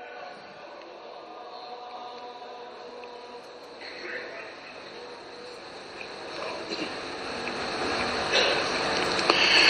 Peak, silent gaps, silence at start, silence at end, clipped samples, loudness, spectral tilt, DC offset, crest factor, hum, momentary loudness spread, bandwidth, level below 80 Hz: -2 dBFS; none; 0 s; 0 s; under 0.1%; -28 LUFS; -2 dB/octave; under 0.1%; 28 dB; none; 20 LU; 9.6 kHz; -60 dBFS